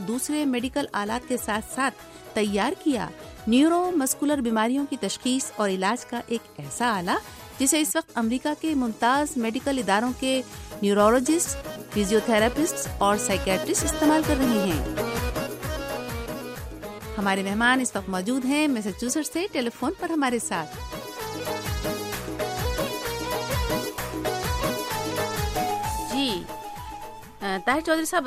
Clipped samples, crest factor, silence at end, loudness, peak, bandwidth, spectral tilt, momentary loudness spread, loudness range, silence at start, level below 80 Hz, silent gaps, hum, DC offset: under 0.1%; 18 dB; 0 s; -25 LUFS; -6 dBFS; 15.5 kHz; -4 dB/octave; 11 LU; 5 LU; 0 s; -42 dBFS; none; none; under 0.1%